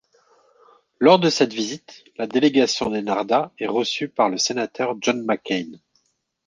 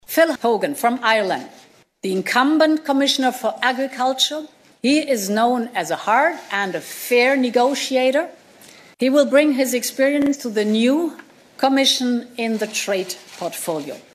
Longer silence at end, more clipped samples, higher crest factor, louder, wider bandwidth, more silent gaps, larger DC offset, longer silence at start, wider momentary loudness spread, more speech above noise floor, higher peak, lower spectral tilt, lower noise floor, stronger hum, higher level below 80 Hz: first, 0.7 s vs 0.15 s; neither; about the same, 20 dB vs 18 dB; about the same, -21 LUFS vs -19 LUFS; second, 10 kHz vs 15 kHz; neither; neither; first, 1 s vs 0.1 s; about the same, 12 LU vs 10 LU; first, 49 dB vs 27 dB; about the same, -2 dBFS vs -2 dBFS; about the same, -4 dB/octave vs -3 dB/octave; first, -70 dBFS vs -46 dBFS; neither; first, -64 dBFS vs -70 dBFS